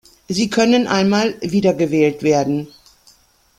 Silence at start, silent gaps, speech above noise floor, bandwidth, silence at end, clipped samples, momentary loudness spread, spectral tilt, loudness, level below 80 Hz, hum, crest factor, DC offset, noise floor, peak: 0.3 s; none; 37 dB; 15 kHz; 0.9 s; under 0.1%; 8 LU; -5.5 dB/octave; -17 LUFS; -54 dBFS; none; 16 dB; under 0.1%; -53 dBFS; -2 dBFS